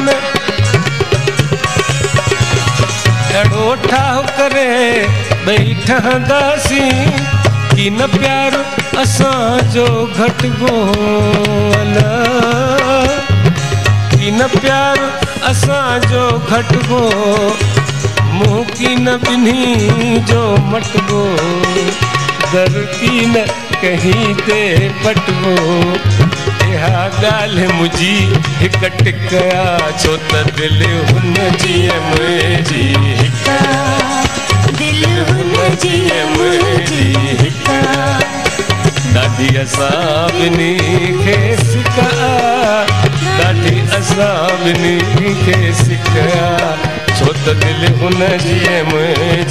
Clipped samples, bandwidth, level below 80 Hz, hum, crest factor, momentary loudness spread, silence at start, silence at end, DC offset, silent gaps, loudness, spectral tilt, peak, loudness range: under 0.1%; 14 kHz; -34 dBFS; none; 10 dB; 2 LU; 0 s; 0 s; 2%; none; -12 LUFS; -5 dB/octave; 0 dBFS; 1 LU